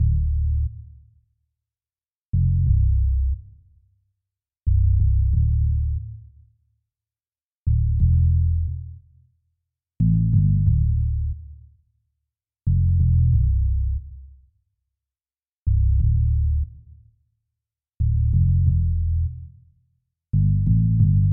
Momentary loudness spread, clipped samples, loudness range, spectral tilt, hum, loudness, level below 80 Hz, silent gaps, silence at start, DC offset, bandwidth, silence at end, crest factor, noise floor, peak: 12 LU; under 0.1%; 3 LU; -18 dB/octave; none; -22 LUFS; -24 dBFS; 2.16-2.33 s, 7.45-7.66 s, 15.58-15.66 s; 0 s; under 0.1%; 0.5 kHz; 0 s; 14 dB; under -90 dBFS; -6 dBFS